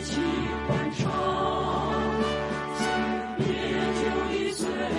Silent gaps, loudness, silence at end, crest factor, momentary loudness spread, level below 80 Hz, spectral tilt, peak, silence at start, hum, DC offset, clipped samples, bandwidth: none; -27 LUFS; 0 s; 14 dB; 3 LU; -46 dBFS; -5.5 dB/octave; -14 dBFS; 0 s; none; under 0.1%; under 0.1%; 11.5 kHz